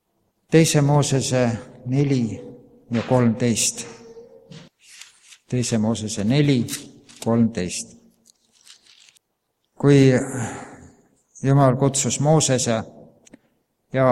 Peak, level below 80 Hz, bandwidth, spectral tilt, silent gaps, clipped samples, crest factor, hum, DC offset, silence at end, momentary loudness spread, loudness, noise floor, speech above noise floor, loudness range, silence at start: -2 dBFS; -54 dBFS; 15 kHz; -5.5 dB/octave; none; under 0.1%; 20 dB; none; under 0.1%; 0 s; 15 LU; -20 LUFS; -74 dBFS; 55 dB; 5 LU; 0.5 s